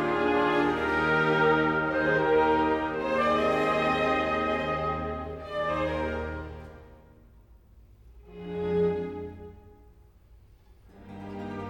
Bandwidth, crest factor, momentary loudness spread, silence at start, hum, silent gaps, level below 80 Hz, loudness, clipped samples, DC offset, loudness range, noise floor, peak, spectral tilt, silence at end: 15.5 kHz; 16 dB; 17 LU; 0 s; none; none; -48 dBFS; -26 LUFS; under 0.1%; under 0.1%; 10 LU; -55 dBFS; -12 dBFS; -6.5 dB/octave; 0 s